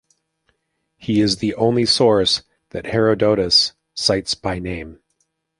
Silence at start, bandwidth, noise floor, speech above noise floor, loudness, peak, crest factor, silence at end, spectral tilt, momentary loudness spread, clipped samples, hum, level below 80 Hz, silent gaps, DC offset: 1 s; 11.5 kHz; -71 dBFS; 53 dB; -17 LUFS; -2 dBFS; 18 dB; 0.65 s; -4.5 dB/octave; 16 LU; under 0.1%; none; -46 dBFS; none; under 0.1%